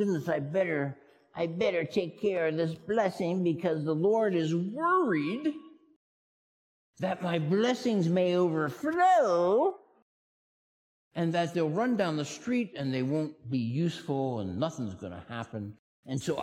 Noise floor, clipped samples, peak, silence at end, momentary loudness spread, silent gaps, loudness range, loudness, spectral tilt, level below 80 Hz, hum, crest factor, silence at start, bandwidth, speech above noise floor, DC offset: under -90 dBFS; under 0.1%; -14 dBFS; 0 s; 12 LU; 5.96-6.93 s, 10.02-11.11 s, 15.79-16.03 s; 5 LU; -29 LUFS; -6.5 dB/octave; -74 dBFS; none; 16 dB; 0 s; 14.5 kHz; over 61 dB; under 0.1%